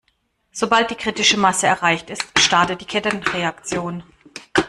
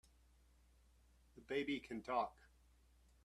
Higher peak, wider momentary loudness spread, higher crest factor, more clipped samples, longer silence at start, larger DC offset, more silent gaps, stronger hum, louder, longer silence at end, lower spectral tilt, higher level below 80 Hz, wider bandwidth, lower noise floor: first, -2 dBFS vs -26 dBFS; first, 15 LU vs 4 LU; about the same, 18 dB vs 22 dB; neither; second, 0.55 s vs 1.35 s; neither; neither; neither; first, -18 LUFS vs -44 LUFS; second, 0 s vs 0.9 s; second, -2.5 dB/octave vs -5 dB/octave; first, -52 dBFS vs -70 dBFS; about the same, 14 kHz vs 13.5 kHz; second, -67 dBFS vs -71 dBFS